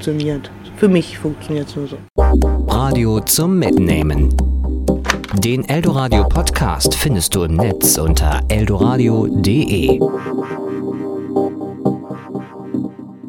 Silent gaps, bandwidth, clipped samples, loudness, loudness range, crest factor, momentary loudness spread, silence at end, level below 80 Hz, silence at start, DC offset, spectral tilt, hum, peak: 2.10-2.15 s; 17.5 kHz; under 0.1%; -16 LUFS; 4 LU; 16 dB; 10 LU; 0 s; -22 dBFS; 0 s; under 0.1%; -5 dB/octave; none; 0 dBFS